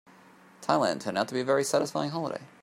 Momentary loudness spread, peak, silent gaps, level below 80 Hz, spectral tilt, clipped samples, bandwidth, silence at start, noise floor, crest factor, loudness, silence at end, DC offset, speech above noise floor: 9 LU; -8 dBFS; none; -74 dBFS; -4.5 dB/octave; under 0.1%; 16 kHz; 0.6 s; -55 dBFS; 22 dB; -29 LUFS; 0.15 s; under 0.1%; 27 dB